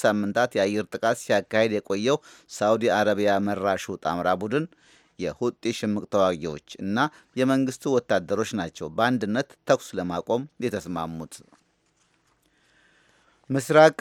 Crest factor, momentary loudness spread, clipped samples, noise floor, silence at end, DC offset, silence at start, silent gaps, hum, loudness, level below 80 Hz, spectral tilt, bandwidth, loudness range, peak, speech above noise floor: 22 dB; 10 LU; under 0.1%; -68 dBFS; 0.1 s; under 0.1%; 0 s; none; none; -25 LUFS; -62 dBFS; -5 dB/octave; 17 kHz; 6 LU; -2 dBFS; 43 dB